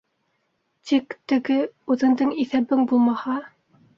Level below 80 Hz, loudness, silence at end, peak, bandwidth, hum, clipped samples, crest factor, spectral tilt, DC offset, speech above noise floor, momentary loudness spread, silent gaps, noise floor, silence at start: -68 dBFS; -22 LUFS; 0.5 s; -8 dBFS; 7.2 kHz; none; under 0.1%; 14 dB; -6 dB/octave; under 0.1%; 51 dB; 8 LU; none; -72 dBFS; 0.85 s